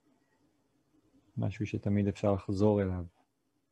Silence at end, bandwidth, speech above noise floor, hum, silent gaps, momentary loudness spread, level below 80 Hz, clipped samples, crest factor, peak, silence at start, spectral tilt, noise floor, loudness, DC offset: 0.65 s; 8.6 kHz; 47 dB; none; none; 13 LU; -62 dBFS; under 0.1%; 20 dB; -14 dBFS; 1.35 s; -8.5 dB/octave; -77 dBFS; -32 LUFS; under 0.1%